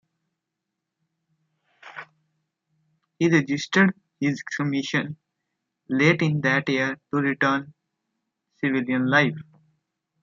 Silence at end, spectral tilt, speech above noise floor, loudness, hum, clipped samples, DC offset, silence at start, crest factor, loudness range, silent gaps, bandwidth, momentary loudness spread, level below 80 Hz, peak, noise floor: 0.8 s; -6 dB/octave; 61 dB; -23 LUFS; none; under 0.1%; under 0.1%; 1.85 s; 22 dB; 3 LU; none; 7.6 kHz; 17 LU; -70 dBFS; -4 dBFS; -83 dBFS